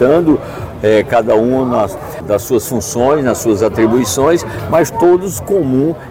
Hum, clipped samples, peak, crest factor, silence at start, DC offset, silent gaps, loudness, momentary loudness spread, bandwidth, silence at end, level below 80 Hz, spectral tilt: none; under 0.1%; -2 dBFS; 12 dB; 0 s; 0.2%; none; -13 LUFS; 6 LU; 17 kHz; 0 s; -38 dBFS; -5.5 dB/octave